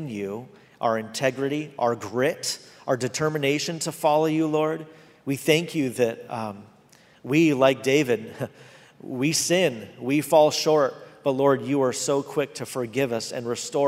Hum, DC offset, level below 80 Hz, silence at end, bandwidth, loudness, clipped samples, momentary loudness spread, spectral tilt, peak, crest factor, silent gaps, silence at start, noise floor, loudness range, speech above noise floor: none; under 0.1%; -70 dBFS; 0 s; 16 kHz; -24 LUFS; under 0.1%; 13 LU; -4.5 dB/octave; -4 dBFS; 20 dB; none; 0 s; -55 dBFS; 3 LU; 31 dB